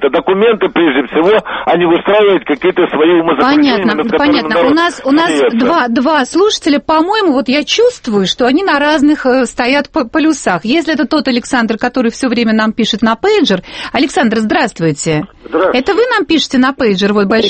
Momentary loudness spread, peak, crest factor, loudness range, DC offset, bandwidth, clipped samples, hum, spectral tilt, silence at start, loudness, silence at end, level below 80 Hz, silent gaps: 4 LU; 0 dBFS; 10 dB; 2 LU; under 0.1%; 8.8 kHz; under 0.1%; none; -4.5 dB/octave; 0 s; -11 LUFS; 0 s; -44 dBFS; none